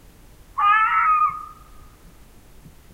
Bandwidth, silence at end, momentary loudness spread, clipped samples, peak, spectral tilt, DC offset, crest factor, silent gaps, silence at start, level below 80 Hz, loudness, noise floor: 16 kHz; 1.4 s; 19 LU; under 0.1%; -6 dBFS; -2.5 dB/octave; under 0.1%; 16 dB; none; 0.55 s; -50 dBFS; -18 LUFS; -47 dBFS